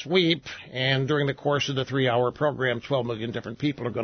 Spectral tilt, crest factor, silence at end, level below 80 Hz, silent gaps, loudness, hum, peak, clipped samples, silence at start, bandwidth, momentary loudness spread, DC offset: -6 dB/octave; 18 dB; 0 s; -60 dBFS; none; -26 LUFS; none; -8 dBFS; under 0.1%; 0 s; 6.6 kHz; 7 LU; under 0.1%